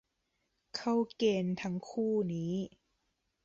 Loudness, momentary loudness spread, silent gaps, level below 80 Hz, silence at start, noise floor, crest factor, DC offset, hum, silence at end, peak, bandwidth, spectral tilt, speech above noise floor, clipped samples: -34 LUFS; 8 LU; none; -72 dBFS; 0.75 s; -81 dBFS; 16 dB; under 0.1%; none; 0.8 s; -18 dBFS; 7.8 kHz; -6.5 dB/octave; 48 dB; under 0.1%